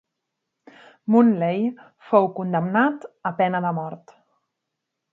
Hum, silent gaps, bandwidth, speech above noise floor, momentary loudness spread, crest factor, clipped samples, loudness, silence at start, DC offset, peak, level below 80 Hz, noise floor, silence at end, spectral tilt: none; none; 4.3 kHz; 60 dB; 13 LU; 20 dB; under 0.1%; -21 LUFS; 1.05 s; under 0.1%; -4 dBFS; -76 dBFS; -81 dBFS; 1.15 s; -9.5 dB/octave